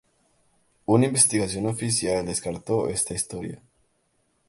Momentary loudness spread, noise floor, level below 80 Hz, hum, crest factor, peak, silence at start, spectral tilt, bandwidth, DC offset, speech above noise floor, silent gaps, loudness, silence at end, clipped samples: 17 LU; -69 dBFS; -54 dBFS; none; 22 dB; -4 dBFS; 0.9 s; -4 dB/octave; 12 kHz; under 0.1%; 45 dB; none; -23 LUFS; 0.95 s; under 0.1%